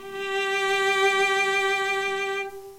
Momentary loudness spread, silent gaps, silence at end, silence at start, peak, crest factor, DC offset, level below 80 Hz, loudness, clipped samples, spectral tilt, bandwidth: 8 LU; none; 0 s; 0 s; -10 dBFS; 14 dB; under 0.1%; -64 dBFS; -23 LUFS; under 0.1%; -1 dB/octave; 16 kHz